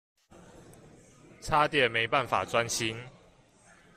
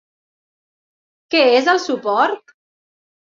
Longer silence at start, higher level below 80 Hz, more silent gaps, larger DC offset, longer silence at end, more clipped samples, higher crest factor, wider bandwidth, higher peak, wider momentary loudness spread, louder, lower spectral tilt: second, 0.55 s vs 1.3 s; first, -56 dBFS vs -72 dBFS; neither; neither; about the same, 0.9 s vs 0.85 s; neither; about the same, 22 dB vs 18 dB; first, 15.5 kHz vs 7.6 kHz; second, -10 dBFS vs -2 dBFS; first, 18 LU vs 7 LU; second, -27 LUFS vs -16 LUFS; about the same, -3 dB/octave vs -2.5 dB/octave